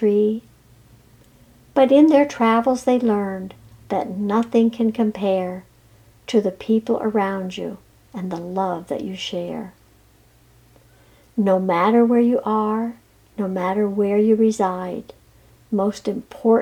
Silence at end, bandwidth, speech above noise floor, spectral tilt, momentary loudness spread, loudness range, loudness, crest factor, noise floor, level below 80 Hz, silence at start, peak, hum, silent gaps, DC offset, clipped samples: 0 s; 12 kHz; 35 dB; -6.5 dB/octave; 15 LU; 8 LU; -20 LUFS; 18 dB; -54 dBFS; -58 dBFS; 0 s; -4 dBFS; none; none; under 0.1%; under 0.1%